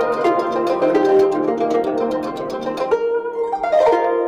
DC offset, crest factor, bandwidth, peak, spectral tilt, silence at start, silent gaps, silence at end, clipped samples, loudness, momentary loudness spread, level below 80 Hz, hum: under 0.1%; 12 dB; 10.5 kHz; -6 dBFS; -6 dB/octave; 0 s; none; 0 s; under 0.1%; -18 LUFS; 8 LU; -56 dBFS; none